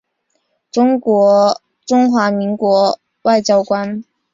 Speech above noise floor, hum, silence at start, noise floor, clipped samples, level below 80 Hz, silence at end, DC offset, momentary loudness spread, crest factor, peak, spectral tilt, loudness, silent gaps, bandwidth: 54 dB; none; 0.75 s; -67 dBFS; under 0.1%; -60 dBFS; 0.3 s; under 0.1%; 10 LU; 14 dB; -2 dBFS; -5.5 dB/octave; -14 LUFS; none; 7.6 kHz